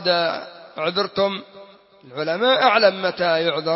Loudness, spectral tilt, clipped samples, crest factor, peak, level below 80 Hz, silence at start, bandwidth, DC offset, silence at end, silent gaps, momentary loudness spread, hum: -20 LUFS; -7.5 dB/octave; under 0.1%; 18 dB; -4 dBFS; -68 dBFS; 0 s; 5.8 kHz; under 0.1%; 0 s; none; 16 LU; none